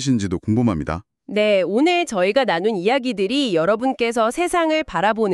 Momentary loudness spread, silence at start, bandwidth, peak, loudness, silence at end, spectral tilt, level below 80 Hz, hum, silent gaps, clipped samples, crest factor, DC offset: 4 LU; 0 s; 13 kHz; -4 dBFS; -19 LUFS; 0 s; -5.5 dB/octave; -46 dBFS; none; none; under 0.1%; 16 dB; under 0.1%